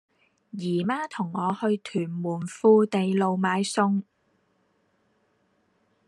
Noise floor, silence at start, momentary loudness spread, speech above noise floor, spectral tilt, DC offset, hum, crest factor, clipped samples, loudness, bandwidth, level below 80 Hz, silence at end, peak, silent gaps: -69 dBFS; 0.55 s; 11 LU; 45 dB; -6 dB/octave; under 0.1%; none; 20 dB; under 0.1%; -25 LUFS; 11.5 kHz; -76 dBFS; 2.05 s; -8 dBFS; none